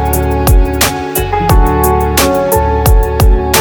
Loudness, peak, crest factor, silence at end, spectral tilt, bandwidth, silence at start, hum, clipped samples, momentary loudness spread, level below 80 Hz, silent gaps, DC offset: -11 LUFS; 0 dBFS; 10 dB; 0 s; -5 dB/octave; over 20 kHz; 0 s; none; under 0.1%; 3 LU; -12 dBFS; none; under 0.1%